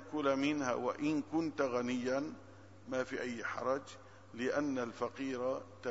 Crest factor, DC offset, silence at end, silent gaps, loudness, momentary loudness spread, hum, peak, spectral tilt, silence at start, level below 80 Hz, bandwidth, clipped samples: 18 dB; under 0.1%; 0 s; none; -37 LUFS; 15 LU; none; -20 dBFS; -4 dB/octave; 0 s; -76 dBFS; 7.6 kHz; under 0.1%